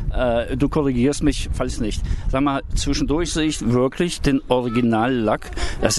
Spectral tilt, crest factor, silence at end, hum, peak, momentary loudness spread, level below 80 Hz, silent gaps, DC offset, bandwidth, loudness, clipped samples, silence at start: -5 dB/octave; 18 dB; 0 s; none; -2 dBFS; 6 LU; -28 dBFS; none; under 0.1%; 12.5 kHz; -21 LUFS; under 0.1%; 0 s